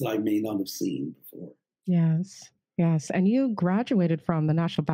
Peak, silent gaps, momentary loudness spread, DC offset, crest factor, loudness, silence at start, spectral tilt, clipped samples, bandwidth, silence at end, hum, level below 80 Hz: -8 dBFS; none; 14 LU; under 0.1%; 18 dB; -26 LUFS; 0 s; -7.5 dB/octave; under 0.1%; 16 kHz; 0 s; none; -68 dBFS